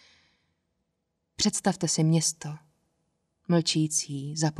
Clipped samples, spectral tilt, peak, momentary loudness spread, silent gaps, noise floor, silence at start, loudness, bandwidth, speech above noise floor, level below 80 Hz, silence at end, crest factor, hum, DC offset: under 0.1%; -4 dB/octave; -10 dBFS; 16 LU; none; -79 dBFS; 1.4 s; -26 LUFS; 13 kHz; 53 dB; -66 dBFS; 0 s; 18 dB; none; under 0.1%